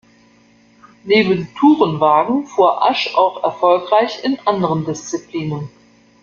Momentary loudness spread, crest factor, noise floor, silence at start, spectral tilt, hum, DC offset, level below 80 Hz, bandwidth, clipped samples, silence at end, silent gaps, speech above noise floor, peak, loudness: 11 LU; 16 dB; -51 dBFS; 1.05 s; -5.5 dB/octave; none; under 0.1%; -58 dBFS; 7.2 kHz; under 0.1%; 0.55 s; none; 36 dB; 0 dBFS; -16 LUFS